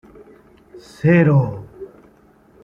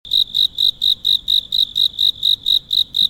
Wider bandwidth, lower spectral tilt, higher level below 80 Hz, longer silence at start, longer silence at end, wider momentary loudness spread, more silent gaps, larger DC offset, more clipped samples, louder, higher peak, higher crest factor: second, 7.2 kHz vs 17 kHz; first, -9.5 dB/octave vs 0 dB/octave; about the same, -52 dBFS vs -50 dBFS; first, 0.75 s vs 0.05 s; first, 0.8 s vs 0 s; first, 25 LU vs 2 LU; neither; neither; neither; about the same, -16 LUFS vs -14 LUFS; first, -2 dBFS vs -6 dBFS; first, 18 dB vs 12 dB